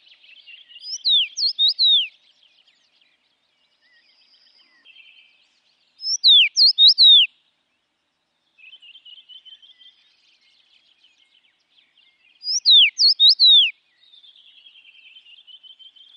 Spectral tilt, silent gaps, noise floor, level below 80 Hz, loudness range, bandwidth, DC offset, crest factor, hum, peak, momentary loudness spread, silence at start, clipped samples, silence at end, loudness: 8 dB/octave; none; -72 dBFS; under -90 dBFS; 8 LU; 10.5 kHz; under 0.1%; 16 dB; none; -4 dBFS; 16 LU; 0.85 s; under 0.1%; 2.45 s; -12 LUFS